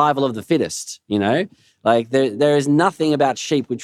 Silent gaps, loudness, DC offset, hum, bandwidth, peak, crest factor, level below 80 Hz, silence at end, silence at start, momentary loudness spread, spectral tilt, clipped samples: none; -19 LUFS; under 0.1%; none; 14 kHz; -2 dBFS; 16 dB; -68 dBFS; 0 s; 0 s; 7 LU; -5 dB/octave; under 0.1%